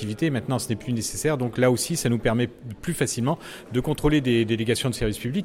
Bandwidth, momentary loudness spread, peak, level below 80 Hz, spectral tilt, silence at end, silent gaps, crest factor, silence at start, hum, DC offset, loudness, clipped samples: 16.5 kHz; 7 LU; -8 dBFS; -42 dBFS; -5 dB/octave; 0 s; none; 16 dB; 0 s; none; under 0.1%; -25 LUFS; under 0.1%